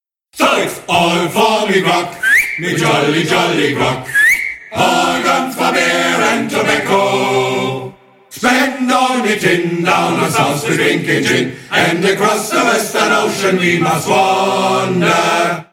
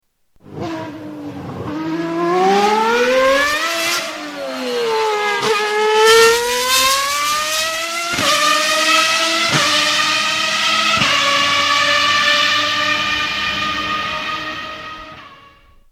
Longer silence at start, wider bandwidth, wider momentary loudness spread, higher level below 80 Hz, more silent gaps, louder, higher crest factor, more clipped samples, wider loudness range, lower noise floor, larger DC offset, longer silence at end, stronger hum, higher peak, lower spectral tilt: about the same, 0.35 s vs 0.45 s; about the same, 17.5 kHz vs 16.5 kHz; second, 4 LU vs 14 LU; about the same, -52 dBFS vs -50 dBFS; neither; about the same, -13 LUFS vs -14 LUFS; about the same, 14 dB vs 16 dB; neither; about the same, 2 LU vs 4 LU; second, -34 dBFS vs -47 dBFS; neither; second, 0.1 s vs 0.6 s; neither; about the same, 0 dBFS vs 0 dBFS; first, -4 dB/octave vs -1.5 dB/octave